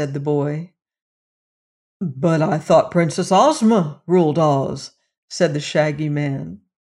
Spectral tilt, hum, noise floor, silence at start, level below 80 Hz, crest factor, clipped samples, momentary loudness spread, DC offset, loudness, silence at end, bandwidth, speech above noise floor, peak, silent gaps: -6.5 dB/octave; none; under -90 dBFS; 0 s; -60 dBFS; 16 dB; under 0.1%; 14 LU; under 0.1%; -18 LUFS; 0.45 s; 11.5 kHz; over 72 dB; -4 dBFS; 1.02-2.00 s, 5.18-5.28 s